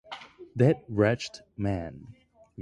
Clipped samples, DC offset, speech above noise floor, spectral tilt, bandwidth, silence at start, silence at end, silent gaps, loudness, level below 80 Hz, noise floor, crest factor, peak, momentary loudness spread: under 0.1%; under 0.1%; 19 dB; -7 dB/octave; 11 kHz; 0.1 s; 0 s; none; -28 LUFS; -52 dBFS; -45 dBFS; 20 dB; -10 dBFS; 19 LU